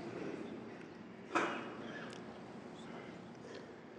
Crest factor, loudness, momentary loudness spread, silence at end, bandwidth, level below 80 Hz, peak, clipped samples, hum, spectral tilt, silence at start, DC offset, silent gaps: 26 dB; -45 LUFS; 14 LU; 0 s; 10 kHz; -78 dBFS; -20 dBFS; under 0.1%; none; -5 dB/octave; 0 s; under 0.1%; none